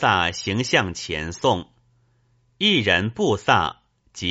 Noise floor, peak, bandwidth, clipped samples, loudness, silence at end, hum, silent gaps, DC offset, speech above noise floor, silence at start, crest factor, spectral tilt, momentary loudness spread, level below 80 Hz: -63 dBFS; -2 dBFS; 8 kHz; under 0.1%; -21 LUFS; 0 s; none; none; under 0.1%; 42 dB; 0 s; 22 dB; -2.5 dB/octave; 9 LU; -50 dBFS